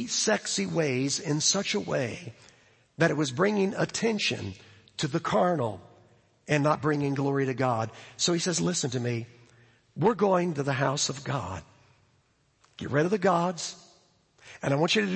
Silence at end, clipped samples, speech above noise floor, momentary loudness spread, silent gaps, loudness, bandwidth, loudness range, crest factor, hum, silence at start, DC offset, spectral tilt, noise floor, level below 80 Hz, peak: 0 s; under 0.1%; 41 dB; 12 LU; none; -27 LUFS; 8.8 kHz; 2 LU; 20 dB; none; 0 s; under 0.1%; -4 dB/octave; -68 dBFS; -66 dBFS; -8 dBFS